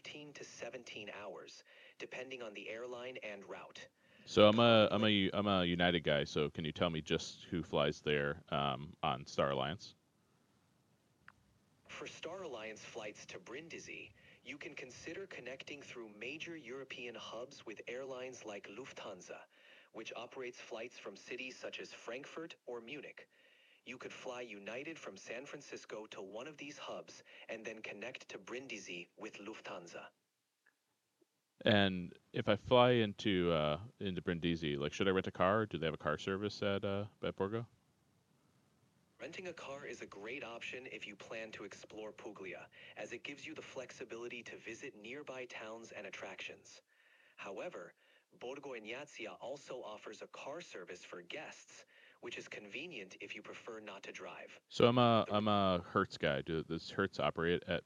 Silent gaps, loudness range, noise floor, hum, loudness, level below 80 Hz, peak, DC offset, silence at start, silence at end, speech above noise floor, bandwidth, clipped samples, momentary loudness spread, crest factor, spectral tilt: none; 15 LU; -84 dBFS; none; -39 LUFS; -72 dBFS; -12 dBFS; under 0.1%; 0.05 s; 0.05 s; 44 dB; 10 kHz; under 0.1%; 18 LU; 28 dB; -5.5 dB/octave